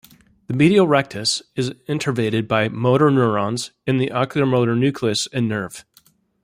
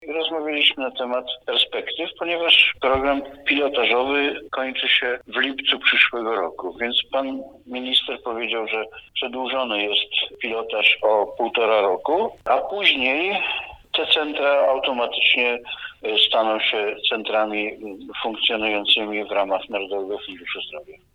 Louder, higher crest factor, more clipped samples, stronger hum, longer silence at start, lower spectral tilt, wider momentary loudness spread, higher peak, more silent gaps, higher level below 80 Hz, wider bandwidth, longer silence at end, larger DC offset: about the same, -19 LUFS vs -20 LUFS; about the same, 18 dB vs 22 dB; neither; neither; first, 0.5 s vs 0 s; first, -5.5 dB/octave vs -3.5 dB/octave; about the same, 10 LU vs 12 LU; about the same, -2 dBFS vs 0 dBFS; neither; about the same, -58 dBFS vs -56 dBFS; first, 16 kHz vs 11.5 kHz; first, 0.65 s vs 0.2 s; neither